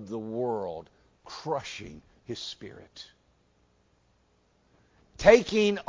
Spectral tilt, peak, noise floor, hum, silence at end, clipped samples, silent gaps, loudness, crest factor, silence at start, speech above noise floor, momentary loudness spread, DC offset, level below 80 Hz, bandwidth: -4.5 dB/octave; -4 dBFS; -67 dBFS; 60 Hz at -70 dBFS; 0.05 s; under 0.1%; none; -26 LUFS; 26 dB; 0 s; 41 dB; 27 LU; under 0.1%; -56 dBFS; 7.6 kHz